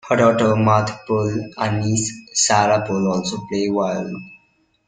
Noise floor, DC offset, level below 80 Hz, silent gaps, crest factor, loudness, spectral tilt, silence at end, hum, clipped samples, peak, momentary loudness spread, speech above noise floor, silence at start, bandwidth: -61 dBFS; under 0.1%; -54 dBFS; none; 18 dB; -19 LUFS; -4.5 dB/octave; 0.5 s; none; under 0.1%; -2 dBFS; 9 LU; 43 dB; 0.05 s; 9.6 kHz